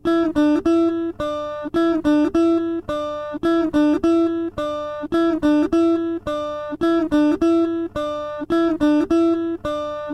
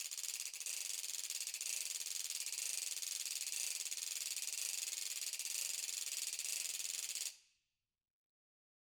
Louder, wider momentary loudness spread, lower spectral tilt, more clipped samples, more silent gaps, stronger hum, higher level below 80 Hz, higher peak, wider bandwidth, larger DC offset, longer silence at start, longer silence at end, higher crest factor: first, -20 LUFS vs -40 LUFS; first, 8 LU vs 2 LU; first, -6.5 dB/octave vs 5.5 dB/octave; neither; neither; neither; first, -46 dBFS vs under -90 dBFS; first, -8 dBFS vs -22 dBFS; second, 8.6 kHz vs over 20 kHz; neither; about the same, 0.05 s vs 0 s; second, 0 s vs 1.55 s; second, 10 dB vs 22 dB